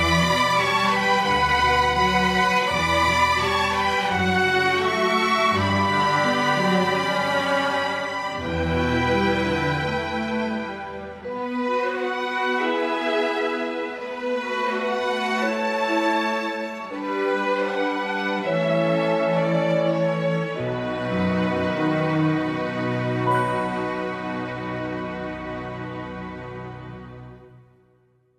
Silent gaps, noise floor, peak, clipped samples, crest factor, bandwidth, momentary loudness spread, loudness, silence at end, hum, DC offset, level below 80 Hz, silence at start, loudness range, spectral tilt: none; -61 dBFS; -6 dBFS; under 0.1%; 16 dB; 15 kHz; 11 LU; -22 LUFS; 0.8 s; none; under 0.1%; -46 dBFS; 0 s; 7 LU; -5 dB/octave